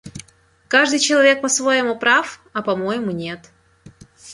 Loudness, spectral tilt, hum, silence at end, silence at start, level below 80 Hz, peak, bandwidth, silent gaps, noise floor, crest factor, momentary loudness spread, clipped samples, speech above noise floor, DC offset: -17 LUFS; -2.5 dB/octave; none; 0 s; 0.05 s; -58 dBFS; -2 dBFS; 11.5 kHz; none; -52 dBFS; 18 dB; 16 LU; under 0.1%; 34 dB; under 0.1%